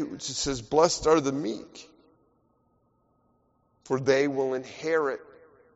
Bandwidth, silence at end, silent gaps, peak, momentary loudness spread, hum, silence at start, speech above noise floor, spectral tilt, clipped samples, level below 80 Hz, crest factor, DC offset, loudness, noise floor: 8 kHz; 0.5 s; none; -8 dBFS; 15 LU; none; 0 s; 42 dB; -3.5 dB/octave; under 0.1%; -56 dBFS; 22 dB; under 0.1%; -26 LUFS; -69 dBFS